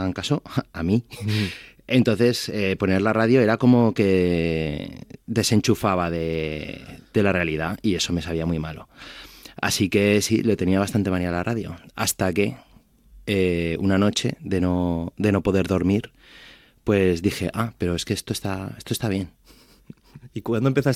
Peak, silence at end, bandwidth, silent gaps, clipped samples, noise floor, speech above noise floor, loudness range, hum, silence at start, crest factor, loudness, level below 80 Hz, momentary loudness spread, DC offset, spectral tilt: -4 dBFS; 0 s; 16 kHz; none; under 0.1%; -54 dBFS; 32 dB; 5 LU; none; 0 s; 18 dB; -22 LUFS; -50 dBFS; 14 LU; under 0.1%; -5.5 dB/octave